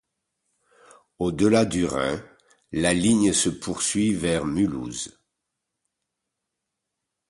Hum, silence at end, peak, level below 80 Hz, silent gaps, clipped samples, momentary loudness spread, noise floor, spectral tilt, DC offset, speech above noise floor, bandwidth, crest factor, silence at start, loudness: none; 2.2 s; -6 dBFS; -50 dBFS; none; under 0.1%; 13 LU; -83 dBFS; -4.5 dB/octave; under 0.1%; 60 dB; 11.5 kHz; 20 dB; 1.2 s; -23 LUFS